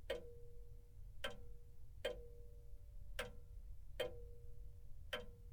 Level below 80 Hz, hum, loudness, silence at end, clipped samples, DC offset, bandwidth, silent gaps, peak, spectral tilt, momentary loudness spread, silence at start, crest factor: -56 dBFS; none; -53 LUFS; 0 s; under 0.1%; under 0.1%; 19 kHz; none; -28 dBFS; -4 dB/octave; 14 LU; 0 s; 22 dB